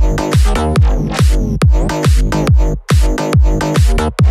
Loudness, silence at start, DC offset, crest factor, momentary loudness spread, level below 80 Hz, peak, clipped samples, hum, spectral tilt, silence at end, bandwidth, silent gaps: -13 LUFS; 0 s; under 0.1%; 8 dB; 1 LU; -14 dBFS; -2 dBFS; under 0.1%; none; -6.5 dB/octave; 0 s; 14 kHz; none